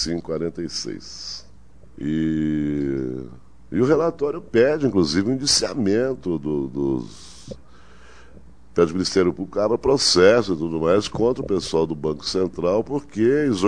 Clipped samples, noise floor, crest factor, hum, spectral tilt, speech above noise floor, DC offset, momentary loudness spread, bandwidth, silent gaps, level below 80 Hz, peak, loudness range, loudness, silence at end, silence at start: under 0.1%; -49 dBFS; 20 dB; none; -4.5 dB/octave; 28 dB; 0.7%; 14 LU; 10.5 kHz; none; -46 dBFS; -2 dBFS; 7 LU; -21 LUFS; 0 s; 0 s